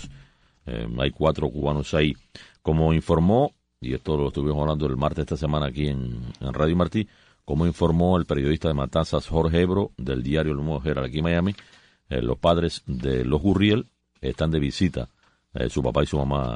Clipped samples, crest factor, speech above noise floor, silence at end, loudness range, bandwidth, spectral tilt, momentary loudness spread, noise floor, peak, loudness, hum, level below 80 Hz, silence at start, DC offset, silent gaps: under 0.1%; 18 dB; 30 dB; 0 s; 2 LU; 10 kHz; -7.5 dB/octave; 12 LU; -53 dBFS; -6 dBFS; -24 LUFS; none; -36 dBFS; 0 s; under 0.1%; none